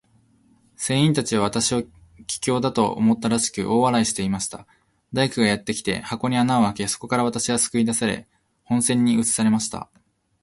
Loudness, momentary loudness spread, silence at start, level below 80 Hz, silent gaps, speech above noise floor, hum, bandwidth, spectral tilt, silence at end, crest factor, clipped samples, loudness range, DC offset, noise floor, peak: -22 LUFS; 11 LU; 0.8 s; -54 dBFS; none; 38 dB; none; 12 kHz; -4 dB/octave; 0.6 s; 18 dB; under 0.1%; 1 LU; under 0.1%; -59 dBFS; -4 dBFS